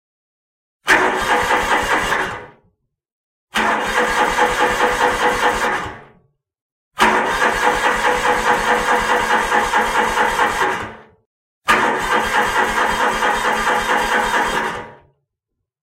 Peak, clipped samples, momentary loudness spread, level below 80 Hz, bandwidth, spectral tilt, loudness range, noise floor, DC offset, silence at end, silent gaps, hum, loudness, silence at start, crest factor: -2 dBFS; under 0.1%; 6 LU; -40 dBFS; 16 kHz; -2.5 dB/octave; 3 LU; -78 dBFS; under 0.1%; 0.9 s; 3.12-3.47 s, 6.61-6.91 s, 11.26-11.62 s; none; -16 LUFS; 0.85 s; 16 dB